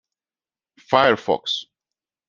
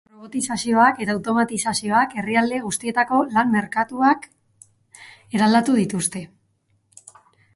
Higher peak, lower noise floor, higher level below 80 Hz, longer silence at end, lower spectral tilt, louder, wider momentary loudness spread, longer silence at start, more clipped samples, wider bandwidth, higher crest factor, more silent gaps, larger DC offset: about the same, -2 dBFS vs -2 dBFS; first, under -90 dBFS vs -66 dBFS; about the same, -64 dBFS vs -62 dBFS; second, 0.65 s vs 1.3 s; about the same, -4 dB/octave vs -4 dB/octave; about the same, -20 LUFS vs -20 LUFS; about the same, 9 LU vs 8 LU; first, 0.9 s vs 0.2 s; neither; second, 7.4 kHz vs 11.5 kHz; about the same, 22 dB vs 18 dB; neither; neither